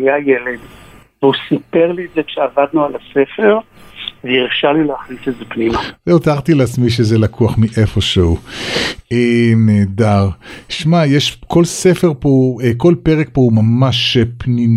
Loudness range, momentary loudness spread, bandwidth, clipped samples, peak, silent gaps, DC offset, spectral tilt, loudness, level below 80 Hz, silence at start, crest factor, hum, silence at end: 3 LU; 8 LU; 13 kHz; under 0.1%; 0 dBFS; none; under 0.1%; -6 dB/octave; -14 LUFS; -36 dBFS; 0 s; 12 dB; none; 0 s